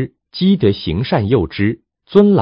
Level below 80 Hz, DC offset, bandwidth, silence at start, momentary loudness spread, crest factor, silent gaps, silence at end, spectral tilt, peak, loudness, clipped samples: -36 dBFS; under 0.1%; 5.4 kHz; 0 s; 7 LU; 14 dB; none; 0 s; -10 dB/octave; 0 dBFS; -16 LUFS; 0.1%